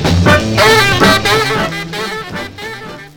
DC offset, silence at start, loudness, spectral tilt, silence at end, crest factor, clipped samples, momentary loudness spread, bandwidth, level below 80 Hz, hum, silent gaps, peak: under 0.1%; 0 s; -10 LUFS; -4 dB/octave; 0.1 s; 12 dB; 0.1%; 17 LU; 19.5 kHz; -32 dBFS; none; none; 0 dBFS